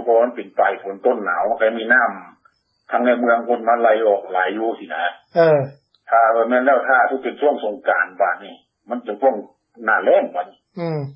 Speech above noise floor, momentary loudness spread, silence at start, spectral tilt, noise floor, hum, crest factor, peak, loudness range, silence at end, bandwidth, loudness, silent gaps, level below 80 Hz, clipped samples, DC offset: 42 dB; 11 LU; 0 s; -9 dB/octave; -60 dBFS; none; 16 dB; -2 dBFS; 3 LU; 0 s; 5.8 kHz; -18 LUFS; none; -74 dBFS; under 0.1%; under 0.1%